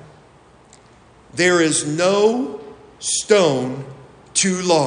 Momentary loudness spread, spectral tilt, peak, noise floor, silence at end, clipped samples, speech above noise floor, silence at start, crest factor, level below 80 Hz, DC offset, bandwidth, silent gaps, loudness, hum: 16 LU; -3.5 dB/octave; -2 dBFS; -49 dBFS; 0 s; under 0.1%; 32 dB; 1.35 s; 18 dB; -58 dBFS; under 0.1%; 10.5 kHz; none; -18 LUFS; none